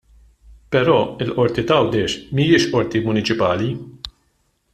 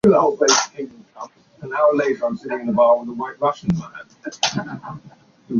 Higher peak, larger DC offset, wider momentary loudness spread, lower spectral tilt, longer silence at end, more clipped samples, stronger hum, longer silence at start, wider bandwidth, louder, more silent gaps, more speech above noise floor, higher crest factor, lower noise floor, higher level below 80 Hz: about the same, -2 dBFS vs -2 dBFS; neither; second, 12 LU vs 22 LU; first, -6 dB/octave vs -4 dB/octave; first, 0.65 s vs 0 s; neither; neither; first, 0.5 s vs 0.05 s; first, 12 kHz vs 7.6 kHz; about the same, -18 LUFS vs -19 LUFS; neither; first, 47 dB vs 19 dB; about the same, 18 dB vs 18 dB; first, -65 dBFS vs -39 dBFS; first, -48 dBFS vs -56 dBFS